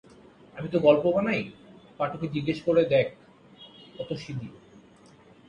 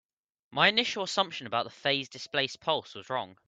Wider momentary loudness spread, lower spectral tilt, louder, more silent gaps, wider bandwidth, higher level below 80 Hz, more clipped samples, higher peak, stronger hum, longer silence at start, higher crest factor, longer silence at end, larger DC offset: first, 21 LU vs 12 LU; first, -7.5 dB/octave vs -3 dB/octave; first, -26 LUFS vs -29 LUFS; neither; about the same, 9 kHz vs 9.2 kHz; first, -62 dBFS vs -74 dBFS; neither; about the same, -6 dBFS vs -6 dBFS; neither; about the same, 0.55 s vs 0.5 s; about the same, 22 dB vs 24 dB; first, 0.9 s vs 0.15 s; neither